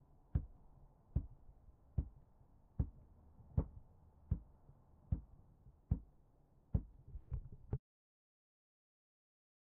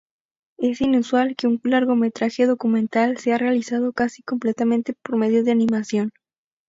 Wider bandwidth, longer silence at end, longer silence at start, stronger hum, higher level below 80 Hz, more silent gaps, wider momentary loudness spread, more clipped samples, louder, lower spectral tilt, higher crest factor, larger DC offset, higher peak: second, 2.2 kHz vs 7.8 kHz; first, 2 s vs 0.6 s; second, 0.35 s vs 0.6 s; neither; first, -50 dBFS vs -60 dBFS; neither; first, 22 LU vs 6 LU; neither; second, -46 LUFS vs -21 LUFS; first, -12.5 dB/octave vs -6 dB/octave; first, 24 dB vs 14 dB; neither; second, -22 dBFS vs -6 dBFS